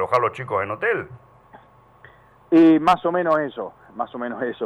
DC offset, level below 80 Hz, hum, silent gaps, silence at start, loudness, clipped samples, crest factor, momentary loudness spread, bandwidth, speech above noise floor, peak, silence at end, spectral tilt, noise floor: under 0.1%; -60 dBFS; none; none; 0 s; -20 LUFS; under 0.1%; 16 dB; 17 LU; 8.4 kHz; 30 dB; -6 dBFS; 0 s; -7 dB/octave; -50 dBFS